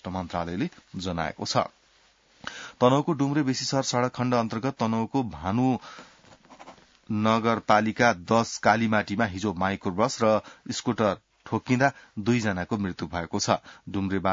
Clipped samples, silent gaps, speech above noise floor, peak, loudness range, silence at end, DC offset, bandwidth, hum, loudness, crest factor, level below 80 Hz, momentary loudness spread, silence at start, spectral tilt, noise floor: under 0.1%; none; 36 dB; -6 dBFS; 4 LU; 0 s; under 0.1%; 7.8 kHz; none; -26 LUFS; 20 dB; -60 dBFS; 10 LU; 0.05 s; -5 dB/octave; -62 dBFS